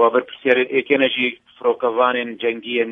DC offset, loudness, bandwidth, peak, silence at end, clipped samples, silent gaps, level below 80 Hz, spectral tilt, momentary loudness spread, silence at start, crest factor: under 0.1%; -19 LUFS; 3.9 kHz; -2 dBFS; 0 s; under 0.1%; none; -72 dBFS; -6.5 dB/octave; 6 LU; 0 s; 16 dB